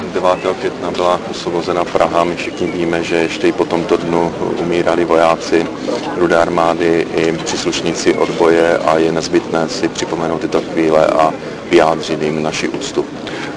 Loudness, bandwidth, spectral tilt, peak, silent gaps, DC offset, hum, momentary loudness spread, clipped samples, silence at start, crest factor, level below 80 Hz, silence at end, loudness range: -15 LUFS; 10.5 kHz; -5 dB/octave; 0 dBFS; none; under 0.1%; none; 7 LU; under 0.1%; 0 s; 14 dB; -46 dBFS; 0 s; 2 LU